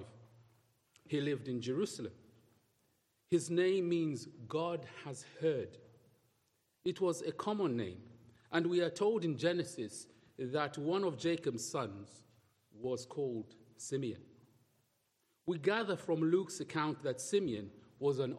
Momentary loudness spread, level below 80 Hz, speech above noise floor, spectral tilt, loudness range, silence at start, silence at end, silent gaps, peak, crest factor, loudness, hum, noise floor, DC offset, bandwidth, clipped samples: 14 LU; -80 dBFS; 43 dB; -5.5 dB/octave; 6 LU; 0 s; 0 s; none; -18 dBFS; 20 dB; -37 LUFS; none; -79 dBFS; under 0.1%; 13 kHz; under 0.1%